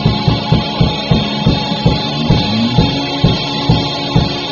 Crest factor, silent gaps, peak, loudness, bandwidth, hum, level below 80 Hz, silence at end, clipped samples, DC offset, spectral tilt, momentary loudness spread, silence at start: 14 dB; none; 0 dBFS; -14 LUFS; 7.2 kHz; none; -26 dBFS; 0 s; under 0.1%; under 0.1%; -5 dB/octave; 2 LU; 0 s